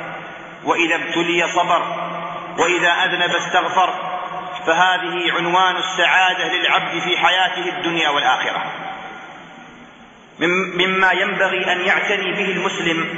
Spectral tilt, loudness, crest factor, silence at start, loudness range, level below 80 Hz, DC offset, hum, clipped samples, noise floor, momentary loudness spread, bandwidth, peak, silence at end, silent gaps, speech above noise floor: -3 dB/octave; -17 LUFS; 18 dB; 0 s; 4 LU; -62 dBFS; under 0.1%; none; under 0.1%; -43 dBFS; 12 LU; 8 kHz; -2 dBFS; 0 s; none; 26 dB